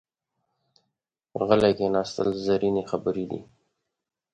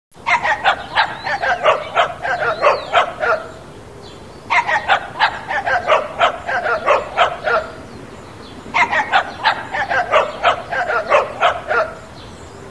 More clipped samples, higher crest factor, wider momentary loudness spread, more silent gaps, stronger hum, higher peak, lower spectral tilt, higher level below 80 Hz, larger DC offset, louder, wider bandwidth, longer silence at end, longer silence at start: neither; about the same, 22 dB vs 18 dB; second, 13 LU vs 20 LU; neither; neither; second, -6 dBFS vs 0 dBFS; first, -6.5 dB/octave vs -3 dB/octave; second, -58 dBFS vs -48 dBFS; second, under 0.1% vs 0.4%; second, -25 LUFS vs -17 LUFS; about the same, 10 kHz vs 11 kHz; first, 0.9 s vs 0 s; first, 1.35 s vs 0.15 s